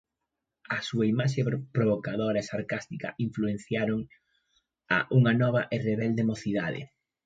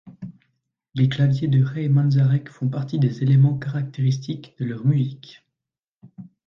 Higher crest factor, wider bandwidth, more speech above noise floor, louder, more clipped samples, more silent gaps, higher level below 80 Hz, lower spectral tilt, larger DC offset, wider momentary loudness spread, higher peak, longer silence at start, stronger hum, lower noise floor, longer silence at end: about the same, 18 dB vs 14 dB; first, 7.8 kHz vs 6.2 kHz; second, 58 dB vs 67 dB; second, -28 LUFS vs -21 LUFS; neither; second, none vs 5.88-6.01 s; about the same, -62 dBFS vs -60 dBFS; second, -7 dB/octave vs -8.5 dB/octave; neither; second, 11 LU vs 15 LU; about the same, -10 dBFS vs -8 dBFS; first, 0.7 s vs 0.05 s; neither; about the same, -85 dBFS vs -87 dBFS; first, 0.4 s vs 0.25 s